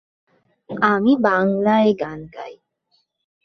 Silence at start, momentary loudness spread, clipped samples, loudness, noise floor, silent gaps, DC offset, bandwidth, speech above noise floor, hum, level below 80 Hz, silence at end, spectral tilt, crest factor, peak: 0.7 s; 19 LU; under 0.1%; -18 LUFS; -67 dBFS; none; under 0.1%; 6.2 kHz; 50 dB; none; -60 dBFS; 0.9 s; -7.5 dB/octave; 18 dB; -2 dBFS